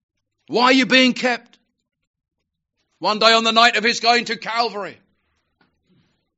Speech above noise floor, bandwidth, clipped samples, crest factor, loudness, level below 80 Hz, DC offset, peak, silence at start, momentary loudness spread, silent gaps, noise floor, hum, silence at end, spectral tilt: 58 dB; 8 kHz; under 0.1%; 20 dB; -16 LUFS; -72 dBFS; under 0.1%; 0 dBFS; 0.5 s; 12 LU; 2.07-2.14 s; -75 dBFS; none; 1.45 s; 0 dB/octave